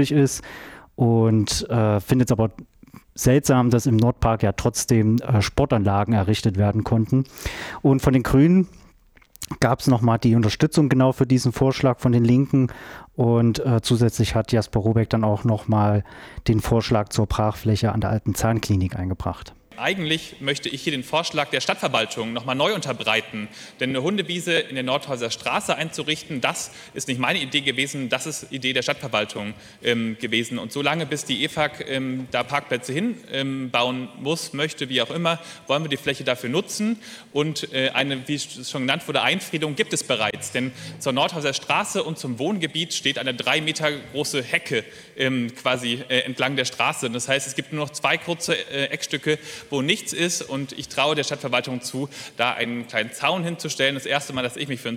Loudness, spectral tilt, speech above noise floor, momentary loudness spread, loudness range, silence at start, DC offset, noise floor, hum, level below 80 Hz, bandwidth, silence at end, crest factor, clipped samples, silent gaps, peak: -22 LUFS; -5 dB/octave; 32 dB; 9 LU; 5 LU; 0 s; under 0.1%; -54 dBFS; none; -44 dBFS; 16.5 kHz; 0 s; 22 dB; under 0.1%; none; 0 dBFS